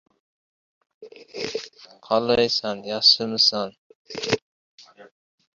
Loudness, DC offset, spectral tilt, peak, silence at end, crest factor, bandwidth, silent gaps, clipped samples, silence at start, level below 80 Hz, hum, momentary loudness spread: -21 LUFS; under 0.1%; -3 dB/octave; -4 dBFS; 0.55 s; 22 dB; 7.6 kHz; 3.78-4.05 s, 4.42-4.78 s; under 0.1%; 1 s; -62 dBFS; none; 18 LU